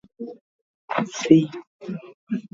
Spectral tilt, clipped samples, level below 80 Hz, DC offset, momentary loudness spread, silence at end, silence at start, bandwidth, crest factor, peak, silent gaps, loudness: -6 dB/octave; under 0.1%; -66 dBFS; under 0.1%; 21 LU; 0.1 s; 0.2 s; 7.6 kHz; 24 dB; 0 dBFS; 0.41-0.88 s, 1.67-1.79 s, 2.14-2.27 s; -22 LUFS